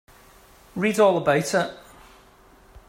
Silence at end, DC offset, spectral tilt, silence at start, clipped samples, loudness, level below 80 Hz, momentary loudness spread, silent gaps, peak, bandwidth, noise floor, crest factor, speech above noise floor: 1.1 s; under 0.1%; -5 dB/octave; 0.75 s; under 0.1%; -22 LUFS; -56 dBFS; 12 LU; none; -6 dBFS; 16 kHz; -53 dBFS; 18 dB; 32 dB